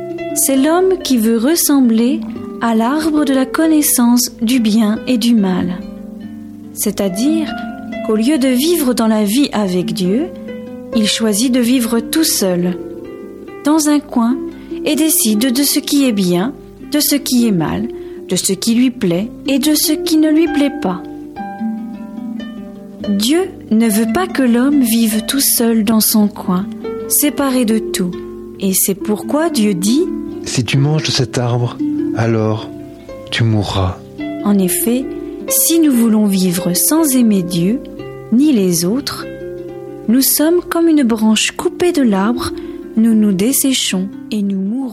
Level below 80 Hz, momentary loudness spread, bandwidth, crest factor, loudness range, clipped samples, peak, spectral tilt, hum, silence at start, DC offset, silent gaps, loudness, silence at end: -46 dBFS; 14 LU; 16.5 kHz; 12 dB; 4 LU; under 0.1%; -2 dBFS; -4.5 dB/octave; none; 0 s; under 0.1%; none; -14 LUFS; 0 s